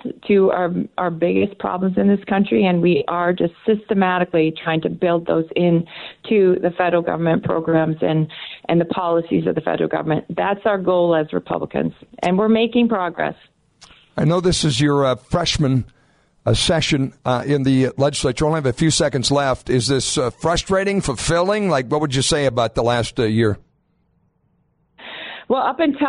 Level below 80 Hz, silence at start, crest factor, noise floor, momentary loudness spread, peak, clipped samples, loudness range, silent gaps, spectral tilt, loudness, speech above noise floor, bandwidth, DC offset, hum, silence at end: -42 dBFS; 0.05 s; 12 dB; -63 dBFS; 6 LU; -6 dBFS; under 0.1%; 2 LU; none; -5.5 dB/octave; -19 LUFS; 45 dB; 11 kHz; under 0.1%; none; 0 s